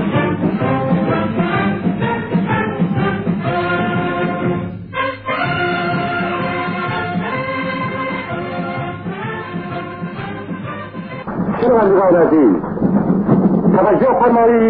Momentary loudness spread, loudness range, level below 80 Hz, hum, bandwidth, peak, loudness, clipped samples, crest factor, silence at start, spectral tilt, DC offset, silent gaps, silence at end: 13 LU; 9 LU; -46 dBFS; none; 4.7 kHz; -2 dBFS; -17 LUFS; under 0.1%; 14 dB; 0 s; -12 dB/octave; 0.2%; none; 0 s